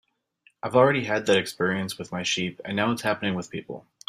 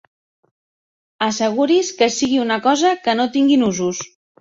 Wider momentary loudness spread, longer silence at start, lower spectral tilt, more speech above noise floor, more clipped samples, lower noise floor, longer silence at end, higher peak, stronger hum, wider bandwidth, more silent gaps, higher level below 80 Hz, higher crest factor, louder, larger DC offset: first, 14 LU vs 8 LU; second, 0.65 s vs 1.2 s; about the same, -4.5 dB/octave vs -3.5 dB/octave; second, 39 dB vs over 73 dB; neither; second, -64 dBFS vs under -90 dBFS; about the same, 0.3 s vs 0.35 s; about the same, -4 dBFS vs -2 dBFS; neither; first, 16 kHz vs 7.8 kHz; neither; second, -66 dBFS vs -60 dBFS; first, 22 dB vs 16 dB; second, -25 LUFS vs -17 LUFS; neither